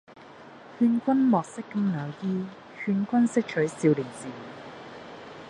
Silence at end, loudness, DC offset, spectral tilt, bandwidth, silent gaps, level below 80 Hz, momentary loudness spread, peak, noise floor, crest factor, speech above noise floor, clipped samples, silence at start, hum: 0 s; -26 LUFS; under 0.1%; -7 dB/octave; 10.5 kHz; none; -70 dBFS; 20 LU; -10 dBFS; -47 dBFS; 18 dB; 22 dB; under 0.1%; 0.15 s; none